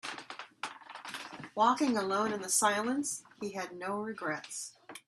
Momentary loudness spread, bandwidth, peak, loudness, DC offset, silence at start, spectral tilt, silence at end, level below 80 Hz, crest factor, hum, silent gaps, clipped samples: 16 LU; 13.5 kHz; -14 dBFS; -33 LUFS; under 0.1%; 0.05 s; -2.5 dB/octave; 0.1 s; -80 dBFS; 20 dB; none; none; under 0.1%